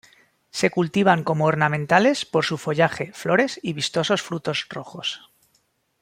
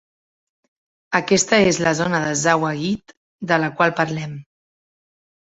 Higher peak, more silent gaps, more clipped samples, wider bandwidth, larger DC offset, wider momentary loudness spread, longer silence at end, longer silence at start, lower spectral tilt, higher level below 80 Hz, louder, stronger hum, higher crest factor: about the same, -2 dBFS vs -2 dBFS; second, none vs 3.17-3.39 s; neither; first, 15.5 kHz vs 8.4 kHz; neither; about the same, 11 LU vs 13 LU; second, 0.85 s vs 1 s; second, 0.55 s vs 1.1 s; about the same, -5 dB/octave vs -4 dB/octave; second, -64 dBFS vs -56 dBFS; second, -22 LUFS vs -19 LUFS; neither; about the same, 20 dB vs 20 dB